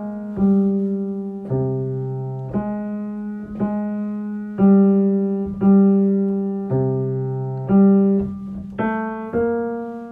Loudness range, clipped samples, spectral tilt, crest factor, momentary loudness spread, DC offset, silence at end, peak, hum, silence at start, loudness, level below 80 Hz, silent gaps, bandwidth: 7 LU; under 0.1%; -12.5 dB/octave; 14 dB; 13 LU; under 0.1%; 0 s; -6 dBFS; none; 0 s; -20 LUFS; -50 dBFS; none; 2.8 kHz